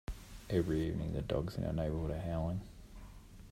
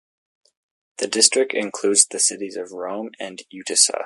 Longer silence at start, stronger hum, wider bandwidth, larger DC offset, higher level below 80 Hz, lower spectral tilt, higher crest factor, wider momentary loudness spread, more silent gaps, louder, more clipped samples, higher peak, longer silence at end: second, 0.1 s vs 1 s; neither; first, 15.5 kHz vs 11.5 kHz; neither; first, -48 dBFS vs -76 dBFS; first, -8 dB/octave vs 0 dB/octave; about the same, 18 dB vs 22 dB; first, 20 LU vs 17 LU; neither; second, -37 LUFS vs -18 LUFS; neither; second, -20 dBFS vs 0 dBFS; about the same, 0 s vs 0 s